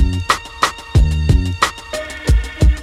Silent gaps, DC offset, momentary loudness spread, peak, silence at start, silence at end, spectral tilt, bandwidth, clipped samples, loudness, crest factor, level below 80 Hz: none; under 0.1%; 6 LU; 0 dBFS; 0 s; 0 s; -5 dB/octave; 14.5 kHz; under 0.1%; -17 LUFS; 14 dB; -18 dBFS